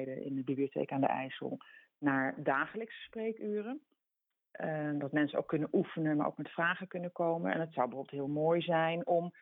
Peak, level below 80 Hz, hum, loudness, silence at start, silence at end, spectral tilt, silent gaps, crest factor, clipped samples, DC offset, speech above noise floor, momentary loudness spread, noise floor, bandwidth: -16 dBFS; -80 dBFS; none; -35 LUFS; 0 s; 0.1 s; -9.5 dB/octave; none; 18 dB; under 0.1%; under 0.1%; 54 dB; 10 LU; -89 dBFS; 4 kHz